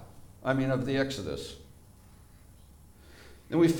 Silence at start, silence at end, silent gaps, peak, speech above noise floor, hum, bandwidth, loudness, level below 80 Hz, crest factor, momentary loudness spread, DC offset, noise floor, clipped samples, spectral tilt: 0 s; 0 s; none; -14 dBFS; 26 dB; none; 18.5 kHz; -31 LUFS; -56 dBFS; 18 dB; 25 LU; under 0.1%; -54 dBFS; under 0.1%; -6.5 dB/octave